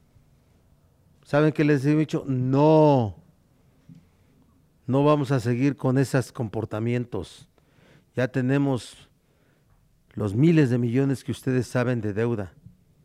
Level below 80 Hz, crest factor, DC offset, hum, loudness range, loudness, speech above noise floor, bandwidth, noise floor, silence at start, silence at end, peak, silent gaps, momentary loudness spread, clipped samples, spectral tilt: -60 dBFS; 18 dB; under 0.1%; none; 6 LU; -23 LUFS; 40 dB; 13.5 kHz; -63 dBFS; 1.3 s; 0.55 s; -6 dBFS; none; 13 LU; under 0.1%; -8 dB/octave